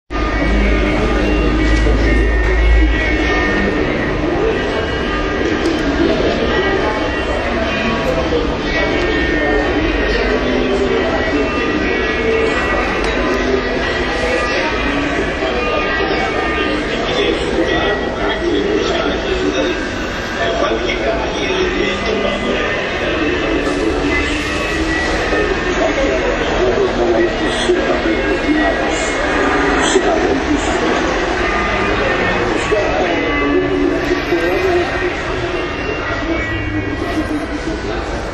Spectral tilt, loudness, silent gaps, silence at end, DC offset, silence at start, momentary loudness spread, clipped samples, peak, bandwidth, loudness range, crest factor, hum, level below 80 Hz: -5 dB/octave; -16 LUFS; none; 0 s; under 0.1%; 0.1 s; 4 LU; under 0.1%; 0 dBFS; 10 kHz; 2 LU; 16 dB; none; -24 dBFS